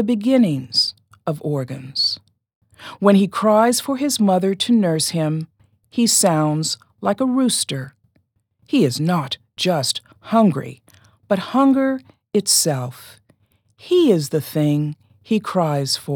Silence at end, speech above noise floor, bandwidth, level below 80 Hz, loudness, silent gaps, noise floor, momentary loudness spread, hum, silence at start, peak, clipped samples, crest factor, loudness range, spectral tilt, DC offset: 0 s; 46 dB; over 20 kHz; -70 dBFS; -19 LUFS; 2.55-2.61 s; -64 dBFS; 12 LU; none; 0 s; -2 dBFS; under 0.1%; 18 dB; 3 LU; -4.5 dB/octave; under 0.1%